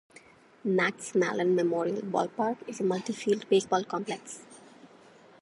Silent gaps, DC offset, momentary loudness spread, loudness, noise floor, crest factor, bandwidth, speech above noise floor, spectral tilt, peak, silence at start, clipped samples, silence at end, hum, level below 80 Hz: none; under 0.1%; 11 LU; -29 LUFS; -56 dBFS; 18 dB; 11.5 kHz; 27 dB; -5 dB/octave; -12 dBFS; 0.65 s; under 0.1%; 0.55 s; none; -78 dBFS